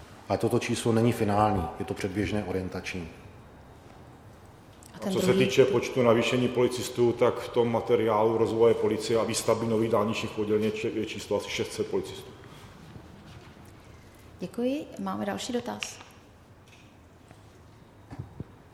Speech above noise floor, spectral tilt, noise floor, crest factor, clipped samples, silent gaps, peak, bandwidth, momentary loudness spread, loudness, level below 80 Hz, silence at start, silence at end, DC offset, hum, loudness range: 27 dB; -5.5 dB/octave; -53 dBFS; 22 dB; under 0.1%; none; -6 dBFS; 16 kHz; 23 LU; -27 LUFS; -54 dBFS; 0 s; 0.2 s; under 0.1%; none; 12 LU